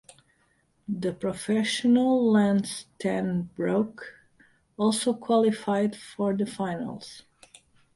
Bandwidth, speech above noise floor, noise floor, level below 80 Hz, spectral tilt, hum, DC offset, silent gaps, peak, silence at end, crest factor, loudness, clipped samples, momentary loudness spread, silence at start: 11.5 kHz; 42 dB; -68 dBFS; -64 dBFS; -5.5 dB/octave; none; under 0.1%; none; -10 dBFS; 0.75 s; 16 dB; -26 LUFS; under 0.1%; 14 LU; 0.9 s